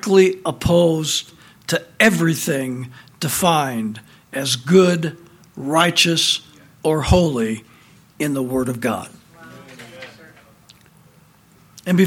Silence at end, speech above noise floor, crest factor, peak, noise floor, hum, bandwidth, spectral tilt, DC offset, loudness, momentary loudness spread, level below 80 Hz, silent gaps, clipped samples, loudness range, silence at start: 0 s; 34 dB; 20 dB; 0 dBFS; -52 dBFS; none; 18 kHz; -4.5 dB/octave; under 0.1%; -18 LUFS; 20 LU; -40 dBFS; none; under 0.1%; 10 LU; 0.05 s